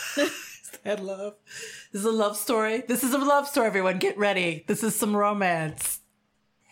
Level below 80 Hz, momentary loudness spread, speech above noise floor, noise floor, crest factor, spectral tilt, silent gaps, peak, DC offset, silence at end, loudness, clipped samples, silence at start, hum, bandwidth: -70 dBFS; 15 LU; 45 dB; -71 dBFS; 16 dB; -3.5 dB/octave; none; -10 dBFS; under 0.1%; 0.75 s; -25 LUFS; under 0.1%; 0 s; none; 17 kHz